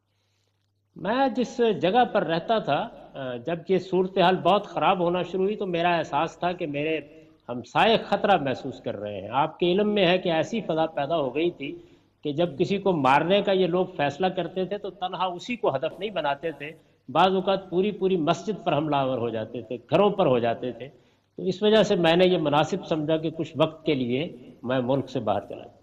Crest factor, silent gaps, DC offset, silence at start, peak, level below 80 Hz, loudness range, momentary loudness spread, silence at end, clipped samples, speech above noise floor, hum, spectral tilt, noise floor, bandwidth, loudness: 18 dB; none; under 0.1%; 0.95 s; -8 dBFS; -62 dBFS; 3 LU; 12 LU; 0.15 s; under 0.1%; 47 dB; none; -6.5 dB/octave; -72 dBFS; 8.8 kHz; -25 LUFS